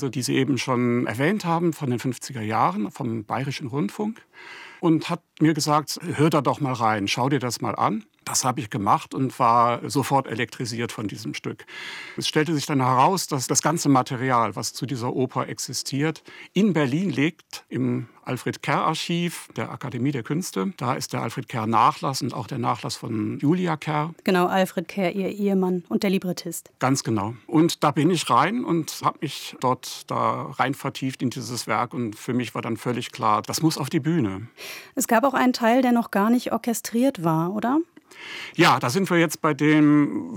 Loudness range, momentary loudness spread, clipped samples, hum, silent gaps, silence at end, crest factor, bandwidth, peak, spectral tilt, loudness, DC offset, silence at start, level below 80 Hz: 4 LU; 11 LU; under 0.1%; none; none; 0 s; 18 dB; 18 kHz; -4 dBFS; -5 dB/octave; -23 LUFS; under 0.1%; 0 s; -74 dBFS